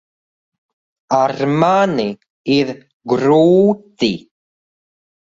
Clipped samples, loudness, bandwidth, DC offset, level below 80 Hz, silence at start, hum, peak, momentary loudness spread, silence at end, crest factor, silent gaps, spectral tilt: under 0.1%; -15 LUFS; 7.8 kHz; under 0.1%; -58 dBFS; 1.1 s; none; 0 dBFS; 13 LU; 1.2 s; 16 dB; 2.30-2.44 s, 2.93-3.00 s; -6.5 dB/octave